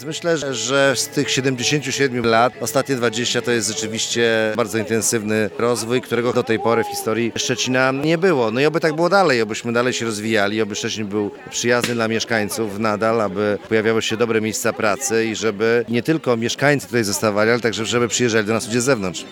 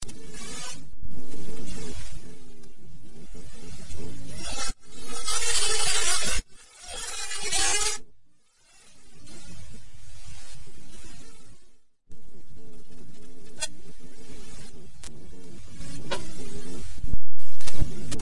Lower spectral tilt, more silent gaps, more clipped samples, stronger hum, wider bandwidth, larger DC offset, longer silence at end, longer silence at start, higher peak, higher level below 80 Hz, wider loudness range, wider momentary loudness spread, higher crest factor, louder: first, -3.5 dB/octave vs -1.5 dB/octave; neither; neither; neither; first, 18 kHz vs 11.5 kHz; second, under 0.1% vs 6%; about the same, 0 s vs 0 s; about the same, 0 s vs 0 s; first, -2 dBFS vs -6 dBFS; second, -62 dBFS vs -42 dBFS; second, 2 LU vs 23 LU; second, 5 LU vs 27 LU; about the same, 18 dB vs 14 dB; first, -19 LUFS vs -30 LUFS